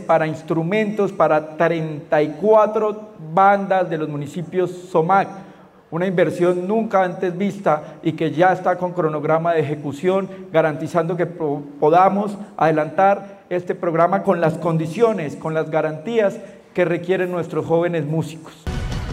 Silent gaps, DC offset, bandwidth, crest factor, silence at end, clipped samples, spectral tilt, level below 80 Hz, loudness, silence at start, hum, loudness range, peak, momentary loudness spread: none; under 0.1%; 13.5 kHz; 18 dB; 0 s; under 0.1%; -7.5 dB/octave; -44 dBFS; -19 LUFS; 0 s; none; 3 LU; -2 dBFS; 9 LU